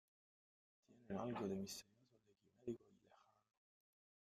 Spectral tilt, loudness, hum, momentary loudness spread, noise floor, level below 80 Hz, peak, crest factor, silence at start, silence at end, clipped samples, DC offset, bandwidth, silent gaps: -5.5 dB/octave; -50 LUFS; none; 9 LU; -75 dBFS; -84 dBFS; -34 dBFS; 20 dB; 0.9 s; 1.2 s; under 0.1%; under 0.1%; 13.5 kHz; none